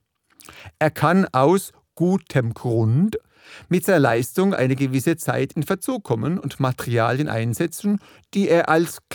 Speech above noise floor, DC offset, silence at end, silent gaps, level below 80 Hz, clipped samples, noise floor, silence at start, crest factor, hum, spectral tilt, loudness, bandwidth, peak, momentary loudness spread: 30 dB; under 0.1%; 0 s; none; -58 dBFS; under 0.1%; -50 dBFS; 0.5 s; 18 dB; none; -6.5 dB/octave; -21 LUFS; 19 kHz; -2 dBFS; 7 LU